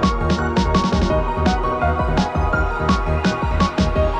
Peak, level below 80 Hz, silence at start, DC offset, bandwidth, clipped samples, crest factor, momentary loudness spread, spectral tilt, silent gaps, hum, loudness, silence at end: -4 dBFS; -24 dBFS; 0 s; under 0.1%; 9.6 kHz; under 0.1%; 14 dB; 2 LU; -6.5 dB/octave; none; none; -19 LUFS; 0 s